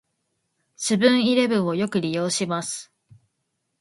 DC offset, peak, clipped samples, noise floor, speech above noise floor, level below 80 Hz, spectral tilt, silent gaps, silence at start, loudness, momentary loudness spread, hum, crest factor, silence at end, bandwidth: under 0.1%; -4 dBFS; under 0.1%; -76 dBFS; 55 dB; -68 dBFS; -4 dB/octave; none; 0.8 s; -22 LUFS; 11 LU; none; 20 dB; 0.95 s; 11.5 kHz